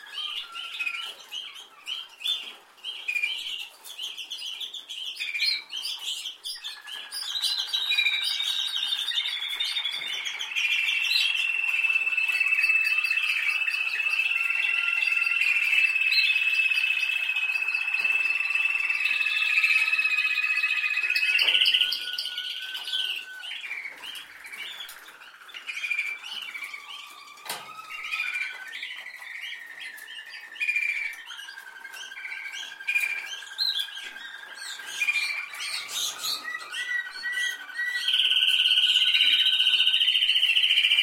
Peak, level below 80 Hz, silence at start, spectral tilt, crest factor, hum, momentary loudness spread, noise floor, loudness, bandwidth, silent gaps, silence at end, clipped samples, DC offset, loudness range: -8 dBFS; -82 dBFS; 0 s; 4 dB/octave; 20 dB; none; 18 LU; -47 dBFS; -24 LUFS; 16.5 kHz; none; 0 s; under 0.1%; under 0.1%; 12 LU